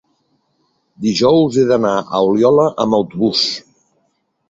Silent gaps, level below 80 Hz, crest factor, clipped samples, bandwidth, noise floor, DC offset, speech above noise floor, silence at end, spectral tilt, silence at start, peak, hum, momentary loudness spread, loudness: none; -54 dBFS; 14 dB; under 0.1%; 8 kHz; -65 dBFS; under 0.1%; 52 dB; 0.9 s; -5.5 dB/octave; 1 s; -2 dBFS; none; 7 LU; -14 LUFS